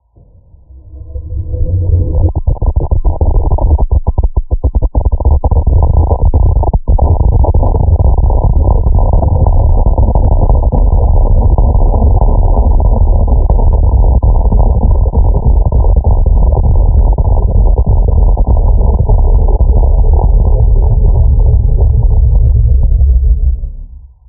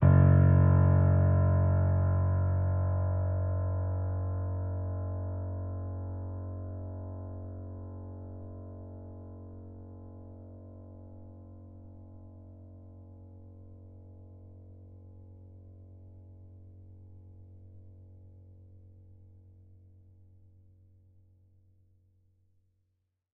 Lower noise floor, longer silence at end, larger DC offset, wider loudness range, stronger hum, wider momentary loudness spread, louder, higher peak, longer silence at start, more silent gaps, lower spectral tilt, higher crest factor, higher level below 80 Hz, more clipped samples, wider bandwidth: second, -42 dBFS vs -79 dBFS; second, 0.3 s vs 5.45 s; neither; second, 3 LU vs 26 LU; neither; second, 4 LU vs 28 LU; first, -11 LUFS vs -29 LUFS; first, 0 dBFS vs -12 dBFS; first, 0.85 s vs 0 s; neither; first, -16.5 dB/octave vs -9.5 dB/octave; second, 8 dB vs 20 dB; first, -8 dBFS vs -50 dBFS; first, 0.1% vs under 0.1%; second, 1.1 kHz vs 2.4 kHz